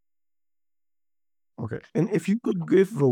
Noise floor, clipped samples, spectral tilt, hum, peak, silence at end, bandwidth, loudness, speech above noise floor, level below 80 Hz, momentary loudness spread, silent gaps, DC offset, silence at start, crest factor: under -90 dBFS; under 0.1%; -8 dB/octave; none; -8 dBFS; 0 s; 14 kHz; -24 LUFS; over 67 dB; -72 dBFS; 14 LU; none; under 0.1%; 1.6 s; 18 dB